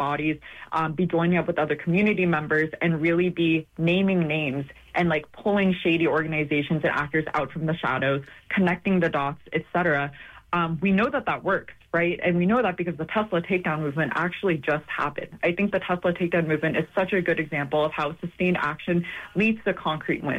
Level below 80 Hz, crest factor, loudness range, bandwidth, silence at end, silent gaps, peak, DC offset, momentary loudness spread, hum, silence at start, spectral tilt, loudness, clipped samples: -54 dBFS; 14 dB; 2 LU; 7.4 kHz; 0 s; none; -10 dBFS; under 0.1%; 6 LU; none; 0 s; -8 dB/octave; -25 LUFS; under 0.1%